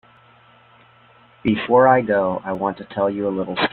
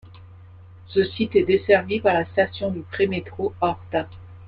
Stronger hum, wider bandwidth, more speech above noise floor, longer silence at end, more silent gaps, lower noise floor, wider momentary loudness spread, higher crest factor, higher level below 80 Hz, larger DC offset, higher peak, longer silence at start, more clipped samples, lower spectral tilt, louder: first, 60 Hz at -50 dBFS vs none; second, 4.5 kHz vs 5.2 kHz; first, 33 dB vs 23 dB; about the same, 0.05 s vs 0 s; neither; first, -51 dBFS vs -44 dBFS; about the same, 11 LU vs 10 LU; about the same, 18 dB vs 20 dB; about the same, -56 dBFS vs -54 dBFS; neither; about the same, -2 dBFS vs -4 dBFS; first, 1.45 s vs 0.05 s; neither; about the same, -9.5 dB/octave vs -9 dB/octave; first, -19 LUFS vs -22 LUFS